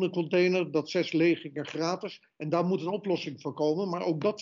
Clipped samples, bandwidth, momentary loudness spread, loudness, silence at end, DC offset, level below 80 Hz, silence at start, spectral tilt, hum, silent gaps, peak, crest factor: under 0.1%; 7.2 kHz; 11 LU; -29 LUFS; 0 s; under 0.1%; -80 dBFS; 0 s; -5 dB/octave; none; none; -14 dBFS; 14 dB